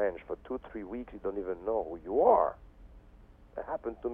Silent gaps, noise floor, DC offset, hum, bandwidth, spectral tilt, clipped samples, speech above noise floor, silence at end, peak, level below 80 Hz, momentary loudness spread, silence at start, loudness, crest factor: none; -56 dBFS; under 0.1%; none; 3.7 kHz; -9.5 dB/octave; under 0.1%; 24 dB; 0 s; -12 dBFS; -56 dBFS; 17 LU; 0 s; -32 LUFS; 22 dB